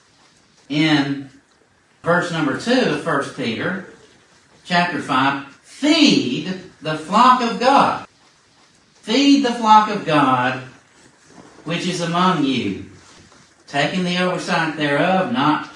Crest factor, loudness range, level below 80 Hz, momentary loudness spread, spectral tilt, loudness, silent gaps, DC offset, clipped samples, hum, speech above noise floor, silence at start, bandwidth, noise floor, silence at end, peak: 18 dB; 5 LU; -64 dBFS; 14 LU; -5 dB/octave; -18 LUFS; none; under 0.1%; under 0.1%; none; 39 dB; 0.7 s; 11.5 kHz; -57 dBFS; 0 s; 0 dBFS